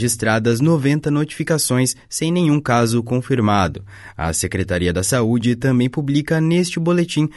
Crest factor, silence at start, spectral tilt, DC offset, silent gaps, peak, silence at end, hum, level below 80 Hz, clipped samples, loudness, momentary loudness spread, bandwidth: 14 dB; 0 s; -5.5 dB/octave; under 0.1%; none; -4 dBFS; 0.05 s; none; -42 dBFS; under 0.1%; -18 LUFS; 5 LU; 12 kHz